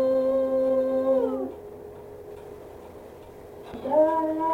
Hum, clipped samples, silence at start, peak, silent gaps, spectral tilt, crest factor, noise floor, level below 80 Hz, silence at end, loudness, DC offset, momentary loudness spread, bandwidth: none; under 0.1%; 0 s; -12 dBFS; none; -7.5 dB/octave; 14 dB; -44 dBFS; -58 dBFS; 0 s; -24 LUFS; under 0.1%; 22 LU; 16 kHz